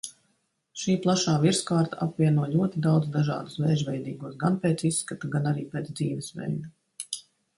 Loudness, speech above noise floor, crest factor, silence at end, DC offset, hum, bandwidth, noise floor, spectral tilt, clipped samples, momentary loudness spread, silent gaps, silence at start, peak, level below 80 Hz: -27 LUFS; 47 dB; 16 dB; 0.35 s; under 0.1%; none; 11.5 kHz; -73 dBFS; -5.5 dB/octave; under 0.1%; 12 LU; none; 0.05 s; -10 dBFS; -64 dBFS